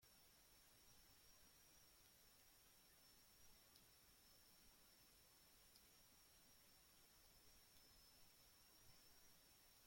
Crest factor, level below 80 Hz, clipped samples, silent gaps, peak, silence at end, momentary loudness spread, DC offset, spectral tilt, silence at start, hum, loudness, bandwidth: 18 dB; -84 dBFS; under 0.1%; none; -54 dBFS; 0 s; 1 LU; under 0.1%; -1.5 dB/octave; 0 s; none; -70 LUFS; 16.5 kHz